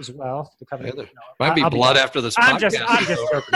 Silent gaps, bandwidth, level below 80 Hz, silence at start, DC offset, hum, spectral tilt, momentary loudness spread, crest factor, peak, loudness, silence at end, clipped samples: none; 12.5 kHz; -54 dBFS; 0 s; under 0.1%; none; -4 dB/octave; 17 LU; 18 dB; -2 dBFS; -17 LUFS; 0 s; under 0.1%